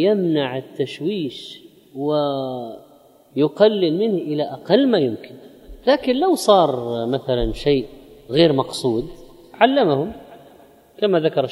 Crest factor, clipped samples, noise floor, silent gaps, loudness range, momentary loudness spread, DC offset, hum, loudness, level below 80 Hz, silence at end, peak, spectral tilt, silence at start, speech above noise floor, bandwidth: 20 dB; under 0.1%; -50 dBFS; none; 4 LU; 15 LU; under 0.1%; none; -19 LUFS; -42 dBFS; 0 s; 0 dBFS; -6 dB/octave; 0 s; 32 dB; 15.5 kHz